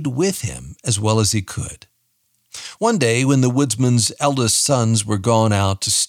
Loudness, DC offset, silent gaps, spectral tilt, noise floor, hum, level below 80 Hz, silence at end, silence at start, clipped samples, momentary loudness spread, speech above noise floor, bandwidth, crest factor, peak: -17 LUFS; under 0.1%; none; -4.5 dB/octave; -66 dBFS; none; -50 dBFS; 0 s; 0 s; under 0.1%; 13 LU; 48 dB; 16 kHz; 18 dB; 0 dBFS